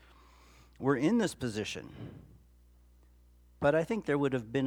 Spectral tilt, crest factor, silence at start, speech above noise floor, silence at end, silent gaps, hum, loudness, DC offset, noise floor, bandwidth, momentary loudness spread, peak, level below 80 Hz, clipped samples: -6 dB/octave; 20 dB; 0.8 s; 30 dB; 0 s; none; 60 Hz at -55 dBFS; -32 LUFS; under 0.1%; -61 dBFS; 17 kHz; 17 LU; -14 dBFS; -60 dBFS; under 0.1%